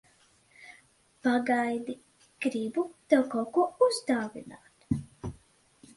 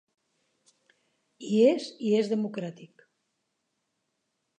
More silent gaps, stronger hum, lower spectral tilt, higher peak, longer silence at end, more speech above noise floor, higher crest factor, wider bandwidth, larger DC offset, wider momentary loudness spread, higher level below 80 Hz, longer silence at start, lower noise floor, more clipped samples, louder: neither; neither; about the same, -5.5 dB/octave vs -6.5 dB/octave; about the same, -8 dBFS vs -10 dBFS; second, 0.65 s vs 1.75 s; second, 36 dB vs 54 dB; about the same, 22 dB vs 20 dB; first, 11.5 kHz vs 9.2 kHz; neither; first, 19 LU vs 16 LU; first, -58 dBFS vs -86 dBFS; second, 0.6 s vs 1.4 s; second, -64 dBFS vs -80 dBFS; neither; second, -29 LUFS vs -26 LUFS